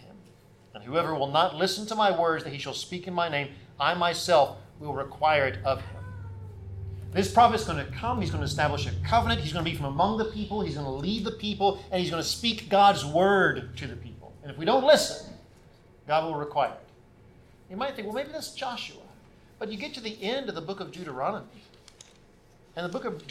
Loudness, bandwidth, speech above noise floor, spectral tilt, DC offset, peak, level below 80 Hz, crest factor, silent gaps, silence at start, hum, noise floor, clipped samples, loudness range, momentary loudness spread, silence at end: -27 LUFS; 16 kHz; 30 dB; -4.5 dB/octave; under 0.1%; -6 dBFS; -50 dBFS; 22 dB; none; 0 s; none; -57 dBFS; under 0.1%; 10 LU; 18 LU; 0 s